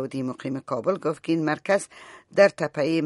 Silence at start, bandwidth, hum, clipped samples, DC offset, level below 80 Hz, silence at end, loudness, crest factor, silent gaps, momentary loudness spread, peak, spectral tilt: 0 s; 11.5 kHz; none; under 0.1%; under 0.1%; -70 dBFS; 0 s; -25 LUFS; 22 dB; none; 10 LU; -4 dBFS; -5.5 dB/octave